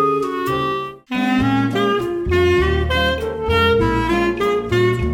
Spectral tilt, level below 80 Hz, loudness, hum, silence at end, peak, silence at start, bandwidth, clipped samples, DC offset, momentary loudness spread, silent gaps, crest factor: -6.5 dB/octave; -30 dBFS; -18 LUFS; none; 0 s; -4 dBFS; 0 s; 17.5 kHz; under 0.1%; under 0.1%; 6 LU; none; 14 dB